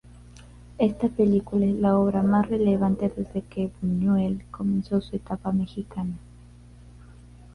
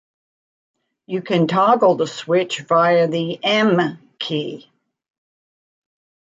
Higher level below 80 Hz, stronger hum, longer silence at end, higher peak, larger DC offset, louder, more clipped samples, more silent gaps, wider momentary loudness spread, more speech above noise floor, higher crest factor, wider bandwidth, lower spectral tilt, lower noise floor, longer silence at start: first, -48 dBFS vs -70 dBFS; first, 60 Hz at -40 dBFS vs none; second, 0.65 s vs 1.75 s; second, -8 dBFS vs -2 dBFS; neither; second, -25 LUFS vs -18 LUFS; neither; neither; about the same, 11 LU vs 13 LU; second, 24 dB vs over 72 dB; about the same, 16 dB vs 18 dB; first, 10 kHz vs 7.8 kHz; first, -9.5 dB/octave vs -5.5 dB/octave; second, -48 dBFS vs under -90 dBFS; second, 0.35 s vs 1.1 s